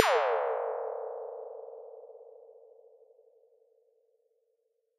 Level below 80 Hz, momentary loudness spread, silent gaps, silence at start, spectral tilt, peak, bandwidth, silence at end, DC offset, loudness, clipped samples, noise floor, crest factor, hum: under -90 dBFS; 25 LU; none; 0 s; 3.5 dB/octave; -4 dBFS; 9 kHz; 2.4 s; under 0.1%; -33 LUFS; under 0.1%; -77 dBFS; 32 dB; none